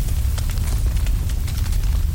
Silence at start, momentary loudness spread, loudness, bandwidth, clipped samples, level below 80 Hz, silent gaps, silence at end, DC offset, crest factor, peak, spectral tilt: 0 s; 2 LU; -23 LUFS; 17 kHz; under 0.1%; -20 dBFS; none; 0 s; under 0.1%; 10 dB; -8 dBFS; -5 dB/octave